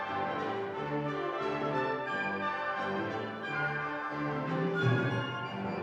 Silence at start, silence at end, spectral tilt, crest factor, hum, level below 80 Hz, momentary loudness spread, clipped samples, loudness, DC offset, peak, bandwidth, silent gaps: 0 s; 0 s; -7 dB/octave; 16 dB; none; -70 dBFS; 6 LU; under 0.1%; -33 LUFS; under 0.1%; -16 dBFS; 8.4 kHz; none